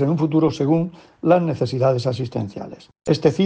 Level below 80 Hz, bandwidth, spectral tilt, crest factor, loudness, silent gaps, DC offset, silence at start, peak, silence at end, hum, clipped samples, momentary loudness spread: -56 dBFS; 8.8 kHz; -8 dB/octave; 16 dB; -20 LUFS; none; under 0.1%; 0 s; -4 dBFS; 0 s; none; under 0.1%; 13 LU